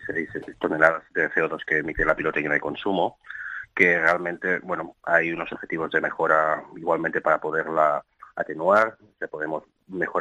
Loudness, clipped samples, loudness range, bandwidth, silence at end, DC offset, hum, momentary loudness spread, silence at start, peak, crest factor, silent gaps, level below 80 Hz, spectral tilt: -24 LUFS; under 0.1%; 2 LU; 10.5 kHz; 0 s; under 0.1%; none; 12 LU; 0 s; -2 dBFS; 24 dB; none; -52 dBFS; -6.5 dB/octave